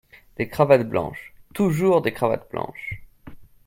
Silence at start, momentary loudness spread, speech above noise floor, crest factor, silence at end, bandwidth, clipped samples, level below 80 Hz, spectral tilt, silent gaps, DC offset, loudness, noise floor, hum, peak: 0.4 s; 20 LU; 21 dB; 22 dB; 0.25 s; 16.5 kHz; under 0.1%; -52 dBFS; -7 dB/octave; none; under 0.1%; -22 LUFS; -43 dBFS; none; -2 dBFS